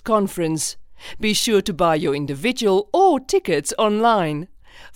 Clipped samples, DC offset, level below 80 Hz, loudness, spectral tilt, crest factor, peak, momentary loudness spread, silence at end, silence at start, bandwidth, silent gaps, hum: under 0.1%; under 0.1%; -48 dBFS; -19 LUFS; -4 dB/octave; 16 dB; -4 dBFS; 9 LU; 0 s; 0.05 s; 17 kHz; none; none